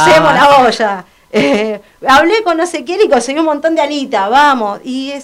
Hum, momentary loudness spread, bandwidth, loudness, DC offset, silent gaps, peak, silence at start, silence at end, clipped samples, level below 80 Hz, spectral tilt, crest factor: none; 12 LU; 16 kHz; -11 LUFS; under 0.1%; none; 0 dBFS; 0 s; 0 s; under 0.1%; -44 dBFS; -4 dB/octave; 10 dB